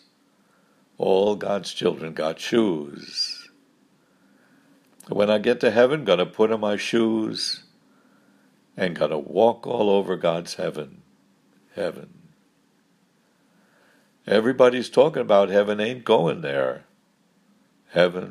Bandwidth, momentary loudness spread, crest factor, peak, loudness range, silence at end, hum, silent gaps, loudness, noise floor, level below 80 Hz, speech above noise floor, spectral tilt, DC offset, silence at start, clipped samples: 13 kHz; 12 LU; 22 dB; -2 dBFS; 9 LU; 0 s; none; none; -22 LUFS; -63 dBFS; -72 dBFS; 42 dB; -5 dB/octave; under 0.1%; 1 s; under 0.1%